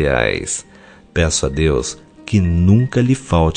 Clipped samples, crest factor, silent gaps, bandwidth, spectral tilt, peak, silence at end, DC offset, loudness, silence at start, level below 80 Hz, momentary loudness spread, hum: under 0.1%; 16 dB; none; 10 kHz; -5.5 dB/octave; -2 dBFS; 0 s; under 0.1%; -17 LUFS; 0 s; -32 dBFS; 11 LU; none